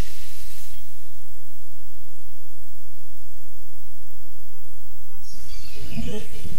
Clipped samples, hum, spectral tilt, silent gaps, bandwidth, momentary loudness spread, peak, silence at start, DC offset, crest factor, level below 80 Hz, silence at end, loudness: under 0.1%; none; -5.5 dB/octave; none; 16 kHz; 14 LU; -8 dBFS; 0 s; 30%; 18 dB; -44 dBFS; 0 s; -42 LUFS